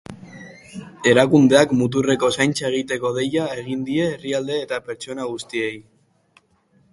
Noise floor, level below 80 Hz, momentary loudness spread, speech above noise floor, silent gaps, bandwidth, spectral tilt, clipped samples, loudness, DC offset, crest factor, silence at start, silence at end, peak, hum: -60 dBFS; -58 dBFS; 24 LU; 41 dB; none; 11.5 kHz; -5 dB/octave; under 0.1%; -20 LUFS; under 0.1%; 20 dB; 0.1 s; 1.1 s; 0 dBFS; none